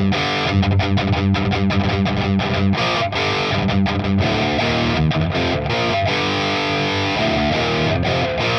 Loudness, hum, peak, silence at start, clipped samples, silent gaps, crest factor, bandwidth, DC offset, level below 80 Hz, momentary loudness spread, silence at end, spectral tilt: -18 LUFS; none; -4 dBFS; 0 s; under 0.1%; none; 14 dB; 8.2 kHz; under 0.1%; -36 dBFS; 1 LU; 0 s; -6 dB/octave